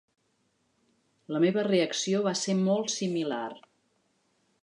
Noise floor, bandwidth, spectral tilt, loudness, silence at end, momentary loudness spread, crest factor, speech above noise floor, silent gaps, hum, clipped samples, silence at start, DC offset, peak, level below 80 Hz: -73 dBFS; 10.5 kHz; -4.5 dB/octave; -28 LUFS; 1.05 s; 9 LU; 16 dB; 46 dB; none; none; under 0.1%; 1.3 s; under 0.1%; -14 dBFS; -82 dBFS